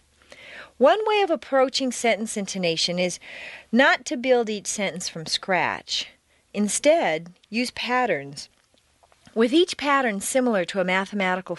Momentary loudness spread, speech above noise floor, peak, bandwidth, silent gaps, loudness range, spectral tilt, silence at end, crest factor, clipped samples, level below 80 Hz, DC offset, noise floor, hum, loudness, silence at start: 13 LU; 40 dB; -6 dBFS; 11.5 kHz; none; 2 LU; -3 dB/octave; 0 s; 18 dB; under 0.1%; -64 dBFS; under 0.1%; -63 dBFS; none; -23 LUFS; 0.4 s